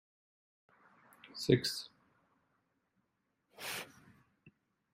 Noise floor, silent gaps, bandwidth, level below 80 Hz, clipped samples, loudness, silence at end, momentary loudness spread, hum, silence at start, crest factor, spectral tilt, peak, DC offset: -83 dBFS; none; 15.5 kHz; -72 dBFS; under 0.1%; -36 LUFS; 0.45 s; 21 LU; none; 1.25 s; 28 dB; -5 dB/octave; -14 dBFS; under 0.1%